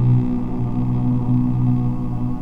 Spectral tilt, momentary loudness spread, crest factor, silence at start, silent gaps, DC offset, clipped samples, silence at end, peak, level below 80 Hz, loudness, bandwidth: -11.5 dB/octave; 5 LU; 12 dB; 0 s; none; under 0.1%; under 0.1%; 0 s; -6 dBFS; -30 dBFS; -20 LUFS; 3.5 kHz